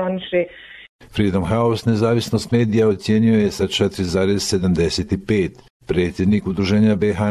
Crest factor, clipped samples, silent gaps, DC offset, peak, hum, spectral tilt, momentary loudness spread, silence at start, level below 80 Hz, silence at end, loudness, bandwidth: 14 dB; under 0.1%; 0.89-0.99 s, 5.70-5.80 s; under 0.1%; -4 dBFS; none; -6 dB/octave; 6 LU; 0 s; -38 dBFS; 0 s; -19 LUFS; 13.5 kHz